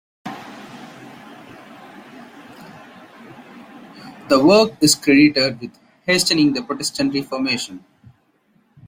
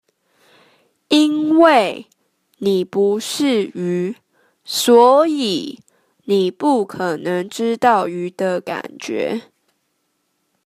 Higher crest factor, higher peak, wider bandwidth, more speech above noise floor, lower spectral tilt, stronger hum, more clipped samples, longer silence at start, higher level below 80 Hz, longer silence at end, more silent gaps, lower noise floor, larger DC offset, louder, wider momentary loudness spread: about the same, 18 dB vs 18 dB; about the same, -2 dBFS vs 0 dBFS; about the same, 16.5 kHz vs 15.5 kHz; second, 44 dB vs 52 dB; about the same, -3.5 dB/octave vs -4.5 dB/octave; neither; neither; second, 0.25 s vs 1.1 s; first, -60 dBFS vs -68 dBFS; second, 1.1 s vs 1.25 s; neither; second, -60 dBFS vs -69 dBFS; neither; about the same, -16 LUFS vs -17 LUFS; first, 27 LU vs 15 LU